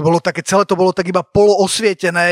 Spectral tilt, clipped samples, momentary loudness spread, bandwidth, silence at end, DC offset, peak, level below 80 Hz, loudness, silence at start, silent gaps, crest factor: -4.5 dB/octave; under 0.1%; 4 LU; 15.5 kHz; 0 s; under 0.1%; 0 dBFS; -46 dBFS; -14 LUFS; 0 s; none; 12 dB